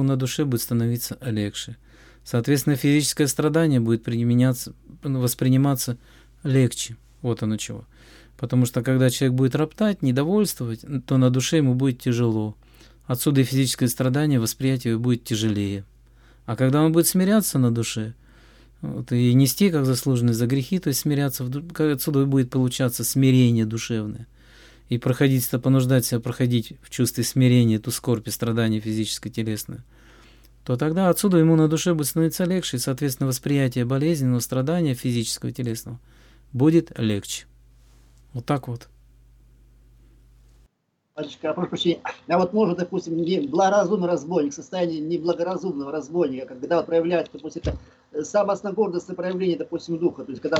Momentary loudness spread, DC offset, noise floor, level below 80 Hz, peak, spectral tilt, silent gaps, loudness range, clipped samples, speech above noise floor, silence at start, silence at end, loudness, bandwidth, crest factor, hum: 12 LU; under 0.1%; -71 dBFS; -52 dBFS; -6 dBFS; -6 dB/octave; none; 5 LU; under 0.1%; 49 dB; 0 s; 0 s; -22 LUFS; 19 kHz; 16 dB; none